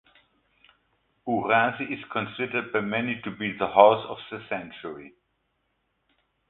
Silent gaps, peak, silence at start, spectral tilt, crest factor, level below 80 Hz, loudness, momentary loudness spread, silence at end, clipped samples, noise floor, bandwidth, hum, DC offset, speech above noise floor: none; -2 dBFS; 1.25 s; -9.5 dB/octave; 26 dB; -66 dBFS; -25 LUFS; 20 LU; 1.4 s; under 0.1%; -74 dBFS; 4.2 kHz; none; under 0.1%; 49 dB